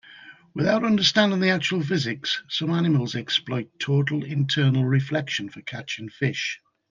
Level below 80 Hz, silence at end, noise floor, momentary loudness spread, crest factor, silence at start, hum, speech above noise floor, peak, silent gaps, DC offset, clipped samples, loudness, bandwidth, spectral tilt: -66 dBFS; 0.35 s; -48 dBFS; 12 LU; 18 dB; 0.1 s; none; 24 dB; -6 dBFS; none; under 0.1%; under 0.1%; -23 LUFS; 7.4 kHz; -5.5 dB/octave